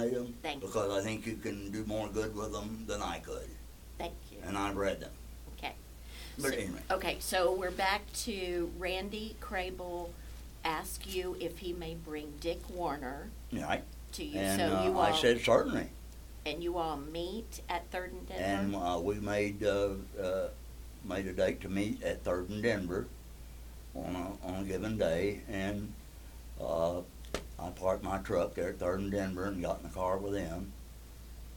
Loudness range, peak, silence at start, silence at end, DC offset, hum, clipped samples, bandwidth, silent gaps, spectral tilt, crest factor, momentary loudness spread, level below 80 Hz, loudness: 8 LU; -14 dBFS; 0 s; 0 s; under 0.1%; none; under 0.1%; 18 kHz; none; -4.5 dB/octave; 22 dB; 15 LU; -48 dBFS; -36 LUFS